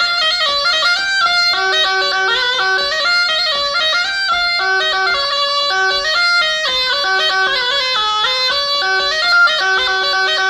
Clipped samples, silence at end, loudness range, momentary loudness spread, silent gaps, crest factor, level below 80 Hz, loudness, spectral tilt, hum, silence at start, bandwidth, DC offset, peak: under 0.1%; 0 s; 1 LU; 2 LU; none; 10 dB; -48 dBFS; -13 LUFS; 0.5 dB/octave; none; 0 s; 15 kHz; under 0.1%; -4 dBFS